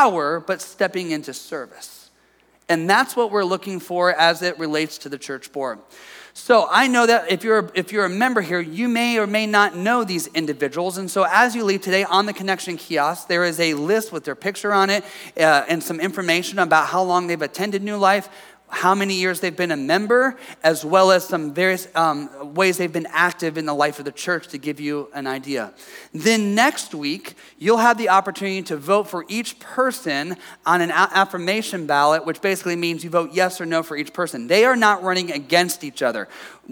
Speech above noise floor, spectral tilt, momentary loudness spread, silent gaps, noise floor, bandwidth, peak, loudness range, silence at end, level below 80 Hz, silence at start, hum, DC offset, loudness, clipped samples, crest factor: 38 dB; -3.5 dB/octave; 12 LU; none; -58 dBFS; over 20 kHz; -2 dBFS; 4 LU; 0 s; -72 dBFS; 0 s; none; under 0.1%; -20 LUFS; under 0.1%; 18 dB